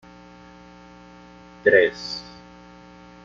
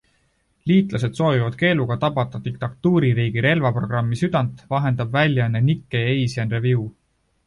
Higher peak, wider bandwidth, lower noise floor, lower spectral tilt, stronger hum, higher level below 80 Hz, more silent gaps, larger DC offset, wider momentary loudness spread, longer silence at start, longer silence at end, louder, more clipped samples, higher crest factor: about the same, -2 dBFS vs -4 dBFS; second, 7.4 kHz vs 11 kHz; second, -46 dBFS vs -65 dBFS; second, -4 dB/octave vs -7.5 dB/octave; first, 60 Hz at -50 dBFS vs none; second, -58 dBFS vs -50 dBFS; neither; neither; first, 26 LU vs 6 LU; first, 1.65 s vs 0.65 s; first, 1.05 s vs 0.55 s; about the same, -21 LUFS vs -21 LUFS; neither; first, 24 dB vs 16 dB